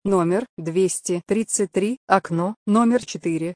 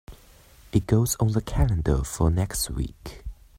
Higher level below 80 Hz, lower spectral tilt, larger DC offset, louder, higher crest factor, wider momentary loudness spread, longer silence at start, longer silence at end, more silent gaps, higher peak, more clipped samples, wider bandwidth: second, -60 dBFS vs -34 dBFS; about the same, -5.5 dB/octave vs -6 dB/octave; neither; first, -22 LUFS vs -25 LUFS; about the same, 20 dB vs 20 dB; second, 6 LU vs 14 LU; about the same, 0.05 s vs 0.1 s; second, 0 s vs 0.25 s; first, 0.49-0.57 s, 1.97-2.08 s, 2.56-2.66 s vs none; first, -2 dBFS vs -6 dBFS; neither; second, 10.5 kHz vs 16.5 kHz